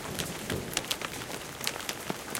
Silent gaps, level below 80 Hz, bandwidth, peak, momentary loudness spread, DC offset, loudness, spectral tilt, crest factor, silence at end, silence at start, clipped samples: none; -56 dBFS; 17 kHz; -8 dBFS; 5 LU; under 0.1%; -34 LUFS; -2.5 dB/octave; 28 dB; 0 s; 0 s; under 0.1%